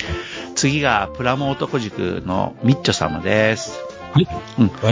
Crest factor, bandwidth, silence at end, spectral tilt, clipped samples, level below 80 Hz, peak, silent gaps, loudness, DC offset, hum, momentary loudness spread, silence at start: 18 dB; 7.8 kHz; 0 s; -5 dB/octave; under 0.1%; -40 dBFS; 0 dBFS; none; -20 LUFS; under 0.1%; none; 7 LU; 0 s